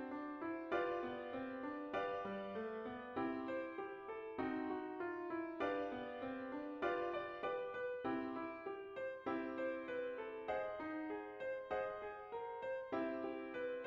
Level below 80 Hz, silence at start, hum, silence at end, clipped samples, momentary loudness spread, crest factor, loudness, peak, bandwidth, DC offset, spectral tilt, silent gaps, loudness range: -76 dBFS; 0 s; none; 0 s; under 0.1%; 5 LU; 16 dB; -44 LUFS; -28 dBFS; 7 kHz; under 0.1%; -7 dB/octave; none; 1 LU